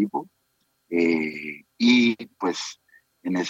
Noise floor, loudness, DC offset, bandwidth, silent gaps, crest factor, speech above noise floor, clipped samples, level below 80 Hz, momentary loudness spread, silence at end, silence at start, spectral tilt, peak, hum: -71 dBFS; -23 LUFS; under 0.1%; 8 kHz; none; 18 dB; 48 dB; under 0.1%; -80 dBFS; 17 LU; 0 s; 0 s; -4 dB/octave; -6 dBFS; none